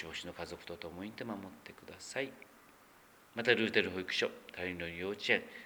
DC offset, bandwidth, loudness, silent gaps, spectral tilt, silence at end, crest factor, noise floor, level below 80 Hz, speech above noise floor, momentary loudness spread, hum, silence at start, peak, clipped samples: under 0.1%; over 20 kHz; -37 LUFS; none; -4 dB/octave; 0 s; 28 dB; -62 dBFS; -70 dBFS; 24 dB; 17 LU; none; 0 s; -12 dBFS; under 0.1%